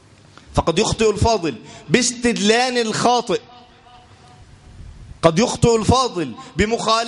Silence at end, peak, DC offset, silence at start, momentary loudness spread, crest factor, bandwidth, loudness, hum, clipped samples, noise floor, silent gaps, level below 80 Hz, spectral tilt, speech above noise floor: 0 s; 0 dBFS; under 0.1%; 0.5 s; 9 LU; 20 dB; 11.5 kHz; -18 LUFS; none; under 0.1%; -46 dBFS; none; -38 dBFS; -4 dB/octave; 29 dB